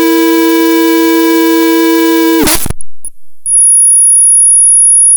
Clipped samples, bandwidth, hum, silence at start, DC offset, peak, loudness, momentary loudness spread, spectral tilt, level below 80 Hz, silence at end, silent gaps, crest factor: under 0.1%; over 20 kHz; none; 0 s; under 0.1%; 0 dBFS; -5 LUFS; 8 LU; -1.5 dB/octave; -32 dBFS; 0 s; none; 6 dB